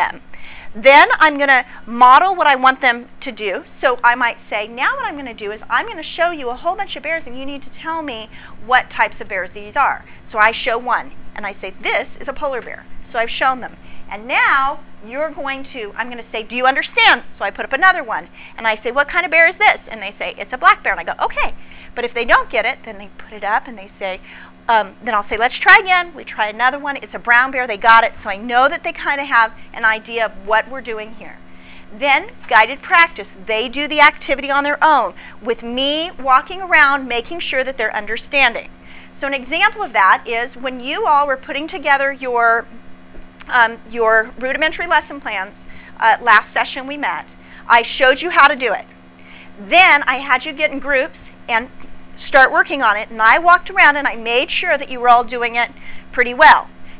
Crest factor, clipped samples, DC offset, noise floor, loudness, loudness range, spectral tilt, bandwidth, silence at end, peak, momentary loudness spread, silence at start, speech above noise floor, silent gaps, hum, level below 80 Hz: 16 dB; 0.3%; under 0.1%; -40 dBFS; -15 LUFS; 7 LU; -5.5 dB/octave; 4 kHz; 0 s; 0 dBFS; 16 LU; 0 s; 24 dB; none; none; -46 dBFS